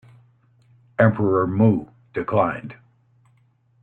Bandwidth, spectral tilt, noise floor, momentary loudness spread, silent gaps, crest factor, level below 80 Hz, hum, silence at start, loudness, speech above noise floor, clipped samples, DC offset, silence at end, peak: 4.1 kHz; -11 dB/octave; -60 dBFS; 16 LU; none; 20 dB; -58 dBFS; none; 1 s; -21 LUFS; 41 dB; under 0.1%; under 0.1%; 1.1 s; -2 dBFS